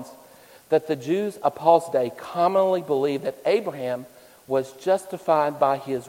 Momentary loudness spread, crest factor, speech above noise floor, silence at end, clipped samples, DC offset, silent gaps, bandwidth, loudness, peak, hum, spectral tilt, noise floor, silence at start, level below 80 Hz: 9 LU; 20 dB; 27 dB; 0 s; under 0.1%; under 0.1%; none; 16.5 kHz; -23 LUFS; -4 dBFS; none; -6 dB/octave; -50 dBFS; 0 s; -70 dBFS